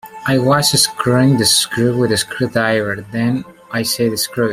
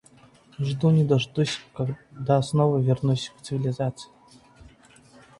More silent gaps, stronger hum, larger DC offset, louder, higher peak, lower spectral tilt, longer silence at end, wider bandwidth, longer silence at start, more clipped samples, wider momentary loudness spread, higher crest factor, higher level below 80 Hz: neither; neither; neither; first, -15 LUFS vs -25 LUFS; first, 0 dBFS vs -6 dBFS; second, -4 dB/octave vs -7 dB/octave; second, 0 s vs 1.35 s; first, 16 kHz vs 11 kHz; second, 0.05 s vs 0.6 s; neither; about the same, 8 LU vs 10 LU; about the same, 16 dB vs 18 dB; first, -50 dBFS vs -58 dBFS